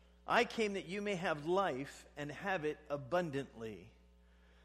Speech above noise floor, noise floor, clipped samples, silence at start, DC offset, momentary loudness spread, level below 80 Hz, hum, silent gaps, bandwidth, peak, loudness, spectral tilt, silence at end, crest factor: 27 dB; -65 dBFS; under 0.1%; 0.25 s; under 0.1%; 14 LU; -66 dBFS; none; none; 13.5 kHz; -18 dBFS; -38 LUFS; -5 dB/octave; 0.75 s; 22 dB